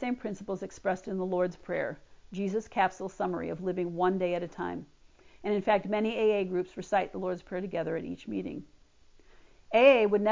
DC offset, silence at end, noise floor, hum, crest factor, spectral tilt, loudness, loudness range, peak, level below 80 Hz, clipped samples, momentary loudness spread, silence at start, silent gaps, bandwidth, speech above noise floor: under 0.1%; 0 s; -58 dBFS; none; 22 dB; -6.5 dB/octave; -30 LUFS; 3 LU; -8 dBFS; -62 dBFS; under 0.1%; 12 LU; 0 s; none; 7.6 kHz; 29 dB